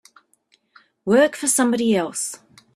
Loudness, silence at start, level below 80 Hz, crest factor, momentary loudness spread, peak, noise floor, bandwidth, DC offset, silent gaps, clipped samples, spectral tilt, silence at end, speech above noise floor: -19 LUFS; 1.05 s; -66 dBFS; 18 dB; 13 LU; -4 dBFS; -63 dBFS; 15.5 kHz; under 0.1%; none; under 0.1%; -3.5 dB/octave; 0.4 s; 44 dB